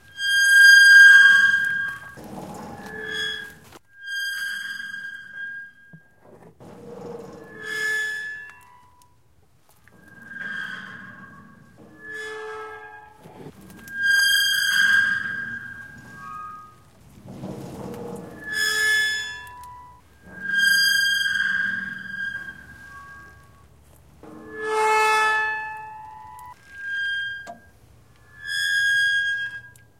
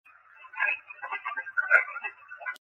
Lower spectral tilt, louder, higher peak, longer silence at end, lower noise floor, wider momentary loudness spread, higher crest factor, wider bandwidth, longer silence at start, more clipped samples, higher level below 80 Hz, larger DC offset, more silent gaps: about the same, 0 dB/octave vs -0.5 dB/octave; first, -18 LUFS vs -28 LUFS; first, -2 dBFS vs -6 dBFS; first, 0.3 s vs 0.05 s; first, -61 dBFS vs -53 dBFS; first, 24 LU vs 16 LU; about the same, 22 dB vs 26 dB; first, 16.5 kHz vs 11.5 kHz; second, 0.15 s vs 0.4 s; neither; first, -60 dBFS vs under -90 dBFS; first, 0.1% vs under 0.1%; neither